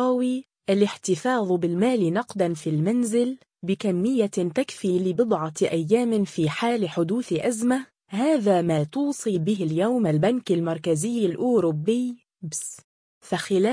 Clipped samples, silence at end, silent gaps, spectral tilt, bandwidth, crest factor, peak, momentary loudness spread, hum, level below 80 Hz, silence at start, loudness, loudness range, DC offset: under 0.1%; 0 s; 12.84-13.21 s; -6 dB/octave; 10.5 kHz; 16 dB; -8 dBFS; 8 LU; none; -66 dBFS; 0 s; -24 LUFS; 1 LU; under 0.1%